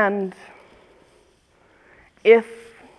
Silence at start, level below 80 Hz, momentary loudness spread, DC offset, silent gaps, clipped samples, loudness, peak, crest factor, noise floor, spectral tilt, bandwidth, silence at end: 0 s; -66 dBFS; 24 LU; under 0.1%; none; under 0.1%; -19 LUFS; -2 dBFS; 22 dB; -58 dBFS; -6.5 dB/octave; 9.6 kHz; 0.45 s